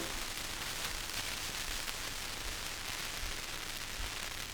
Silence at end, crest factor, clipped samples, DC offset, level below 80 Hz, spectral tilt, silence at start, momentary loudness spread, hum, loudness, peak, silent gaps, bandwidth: 0 s; 24 dB; under 0.1%; under 0.1%; -48 dBFS; -1 dB/octave; 0 s; 2 LU; none; -38 LUFS; -16 dBFS; none; over 20 kHz